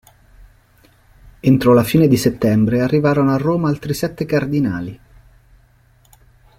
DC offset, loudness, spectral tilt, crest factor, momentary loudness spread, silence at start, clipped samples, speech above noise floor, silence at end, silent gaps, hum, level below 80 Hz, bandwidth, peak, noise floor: under 0.1%; -16 LUFS; -7 dB/octave; 16 dB; 9 LU; 1.25 s; under 0.1%; 37 dB; 1.65 s; none; none; -46 dBFS; 16.5 kHz; -2 dBFS; -53 dBFS